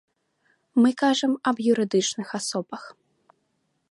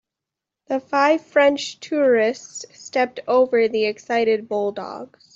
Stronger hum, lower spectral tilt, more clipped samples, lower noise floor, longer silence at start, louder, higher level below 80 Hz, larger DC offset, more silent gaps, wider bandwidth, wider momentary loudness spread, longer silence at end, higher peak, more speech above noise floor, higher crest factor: neither; about the same, -4 dB/octave vs -3.5 dB/octave; neither; second, -73 dBFS vs -86 dBFS; about the same, 0.75 s vs 0.7 s; second, -23 LUFS vs -20 LUFS; second, -76 dBFS vs -70 dBFS; neither; neither; first, 11.5 kHz vs 8 kHz; second, 11 LU vs 15 LU; first, 1.05 s vs 0.3 s; second, -8 dBFS vs -4 dBFS; second, 50 dB vs 65 dB; about the same, 16 dB vs 18 dB